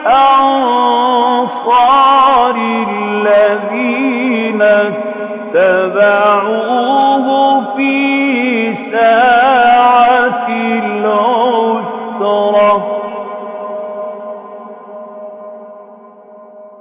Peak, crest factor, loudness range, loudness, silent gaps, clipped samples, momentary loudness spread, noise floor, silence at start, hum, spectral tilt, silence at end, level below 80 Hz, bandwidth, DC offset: 0 dBFS; 10 dB; 7 LU; -11 LUFS; none; under 0.1%; 16 LU; -37 dBFS; 0 s; none; -8 dB/octave; 0.1 s; -56 dBFS; 4 kHz; under 0.1%